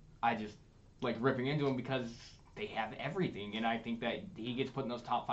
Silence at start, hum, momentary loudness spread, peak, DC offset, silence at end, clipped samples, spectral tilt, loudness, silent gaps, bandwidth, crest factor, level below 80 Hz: 0 s; none; 9 LU; -18 dBFS; under 0.1%; 0 s; under 0.1%; -6.5 dB/octave; -38 LUFS; none; 8 kHz; 20 dB; -64 dBFS